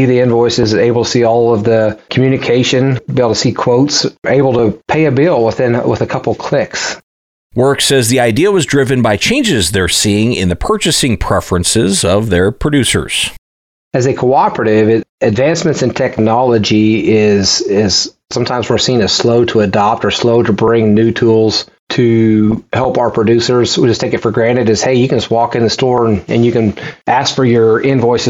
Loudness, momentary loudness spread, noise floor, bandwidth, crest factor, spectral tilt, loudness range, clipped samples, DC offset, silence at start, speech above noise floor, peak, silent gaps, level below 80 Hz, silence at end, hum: -11 LUFS; 5 LU; under -90 dBFS; 16.5 kHz; 10 dB; -5 dB/octave; 2 LU; under 0.1%; under 0.1%; 0 s; over 79 dB; -2 dBFS; 7.03-7.50 s, 13.38-13.91 s, 15.09-15.18 s, 21.79-21.87 s; -36 dBFS; 0 s; none